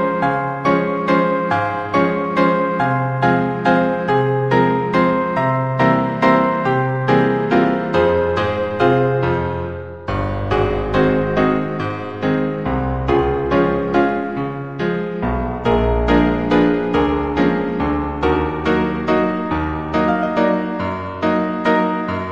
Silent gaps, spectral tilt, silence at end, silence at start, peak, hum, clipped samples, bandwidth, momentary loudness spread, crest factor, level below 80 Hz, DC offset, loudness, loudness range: none; -8 dB/octave; 0 s; 0 s; 0 dBFS; none; under 0.1%; 8.2 kHz; 6 LU; 16 dB; -34 dBFS; 0.4%; -18 LUFS; 3 LU